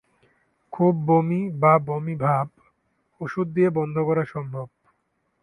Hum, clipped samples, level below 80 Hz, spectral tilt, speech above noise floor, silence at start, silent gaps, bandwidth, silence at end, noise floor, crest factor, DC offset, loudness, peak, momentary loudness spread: none; under 0.1%; -64 dBFS; -10.5 dB/octave; 50 dB; 0.7 s; none; 10.5 kHz; 0.75 s; -72 dBFS; 18 dB; under 0.1%; -23 LUFS; -6 dBFS; 16 LU